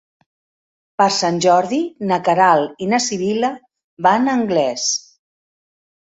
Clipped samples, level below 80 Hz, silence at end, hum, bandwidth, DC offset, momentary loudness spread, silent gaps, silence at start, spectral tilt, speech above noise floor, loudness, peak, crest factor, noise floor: under 0.1%; -62 dBFS; 1.05 s; none; 8 kHz; under 0.1%; 7 LU; 3.84-3.97 s; 1 s; -3.5 dB/octave; over 74 dB; -17 LUFS; -2 dBFS; 16 dB; under -90 dBFS